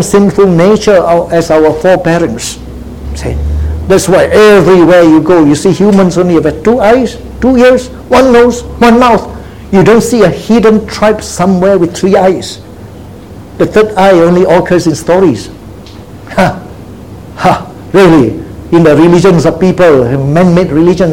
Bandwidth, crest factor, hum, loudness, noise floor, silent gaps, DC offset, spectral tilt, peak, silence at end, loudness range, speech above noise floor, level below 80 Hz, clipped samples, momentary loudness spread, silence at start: 16.5 kHz; 6 dB; none; -7 LUFS; -27 dBFS; none; 0.9%; -6 dB/octave; 0 dBFS; 0 s; 5 LU; 22 dB; -26 dBFS; 3%; 12 LU; 0 s